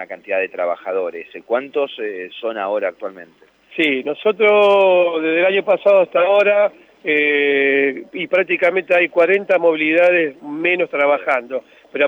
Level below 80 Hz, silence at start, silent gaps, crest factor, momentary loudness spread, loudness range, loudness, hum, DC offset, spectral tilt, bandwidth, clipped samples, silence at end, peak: -72 dBFS; 0 s; none; 12 dB; 13 LU; 8 LU; -16 LUFS; none; under 0.1%; -6 dB/octave; 6.2 kHz; under 0.1%; 0 s; -4 dBFS